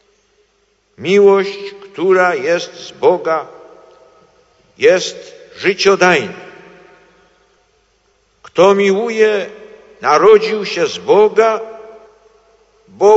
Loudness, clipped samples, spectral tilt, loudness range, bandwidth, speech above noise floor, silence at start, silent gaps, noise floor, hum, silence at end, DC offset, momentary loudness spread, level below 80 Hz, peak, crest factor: -13 LUFS; under 0.1%; -4.5 dB/octave; 5 LU; 8 kHz; 47 dB; 1 s; none; -59 dBFS; none; 0 s; under 0.1%; 18 LU; -62 dBFS; 0 dBFS; 14 dB